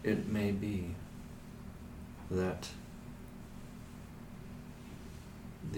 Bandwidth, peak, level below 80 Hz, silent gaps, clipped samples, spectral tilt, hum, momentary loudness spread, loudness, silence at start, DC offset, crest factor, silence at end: 19 kHz; -20 dBFS; -54 dBFS; none; under 0.1%; -6.5 dB/octave; none; 16 LU; -42 LUFS; 0 s; under 0.1%; 20 dB; 0 s